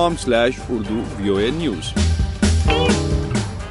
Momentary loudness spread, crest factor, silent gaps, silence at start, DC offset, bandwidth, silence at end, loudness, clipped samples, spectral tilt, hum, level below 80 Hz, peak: 7 LU; 14 dB; none; 0 s; under 0.1%; 11.5 kHz; 0 s; -19 LUFS; under 0.1%; -5.5 dB/octave; none; -26 dBFS; -4 dBFS